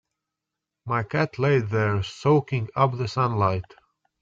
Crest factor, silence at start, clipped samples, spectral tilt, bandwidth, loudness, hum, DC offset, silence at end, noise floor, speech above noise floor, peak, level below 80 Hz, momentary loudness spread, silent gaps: 18 dB; 0.85 s; under 0.1%; -7.5 dB/octave; 7.6 kHz; -24 LUFS; none; under 0.1%; 0.6 s; -85 dBFS; 62 dB; -6 dBFS; -58 dBFS; 7 LU; none